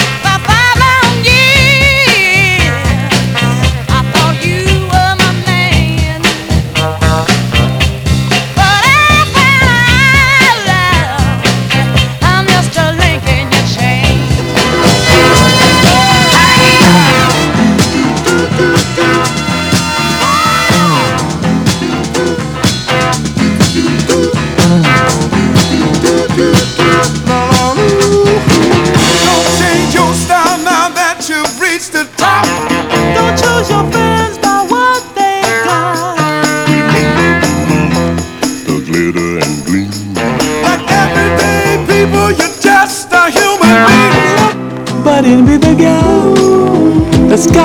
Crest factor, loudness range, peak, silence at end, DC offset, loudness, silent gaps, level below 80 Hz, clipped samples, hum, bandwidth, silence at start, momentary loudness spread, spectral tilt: 8 dB; 5 LU; 0 dBFS; 0 s; under 0.1%; -8 LUFS; none; -24 dBFS; 1%; none; over 20 kHz; 0 s; 7 LU; -4.5 dB/octave